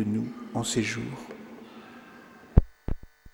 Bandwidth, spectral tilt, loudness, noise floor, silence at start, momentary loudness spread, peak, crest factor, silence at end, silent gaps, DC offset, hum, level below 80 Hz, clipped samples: 18.5 kHz; -5.5 dB/octave; -30 LUFS; -50 dBFS; 0 s; 22 LU; -4 dBFS; 26 dB; 0.05 s; none; under 0.1%; none; -34 dBFS; under 0.1%